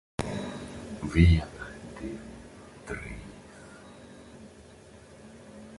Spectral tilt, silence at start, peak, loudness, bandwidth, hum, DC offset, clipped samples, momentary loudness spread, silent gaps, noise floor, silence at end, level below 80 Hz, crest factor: -7 dB/octave; 0.2 s; -6 dBFS; -30 LUFS; 11.5 kHz; none; under 0.1%; under 0.1%; 27 LU; none; -51 dBFS; 0 s; -36 dBFS; 24 dB